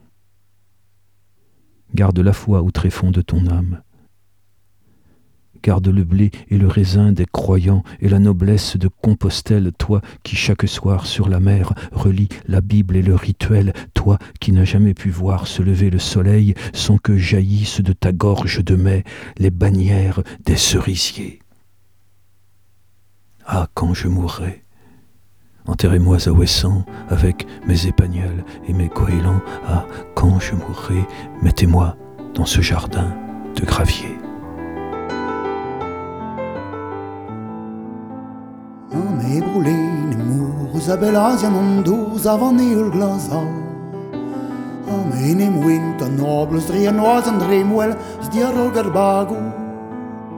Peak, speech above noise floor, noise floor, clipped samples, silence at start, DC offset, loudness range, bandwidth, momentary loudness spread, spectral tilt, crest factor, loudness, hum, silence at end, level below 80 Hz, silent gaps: 0 dBFS; 47 dB; -63 dBFS; under 0.1%; 1.9 s; under 0.1%; 9 LU; 16 kHz; 14 LU; -6.5 dB/octave; 18 dB; -17 LUFS; none; 0 s; -30 dBFS; none